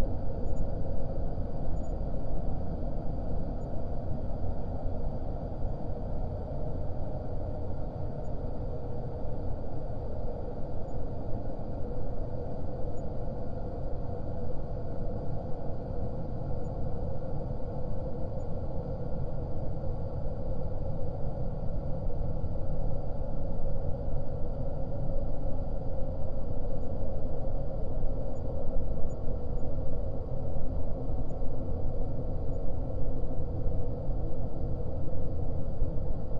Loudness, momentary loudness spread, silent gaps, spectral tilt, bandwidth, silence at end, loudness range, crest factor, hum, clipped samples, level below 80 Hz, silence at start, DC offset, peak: -37 LUFS; 2 LU; none; -10.5 dB/octave; 1.6 kHz; 0 s; 2 LU; 14 dB; none; under 0.1%; -34 dBFS; 0 s; under 0.1%; -14 dBFS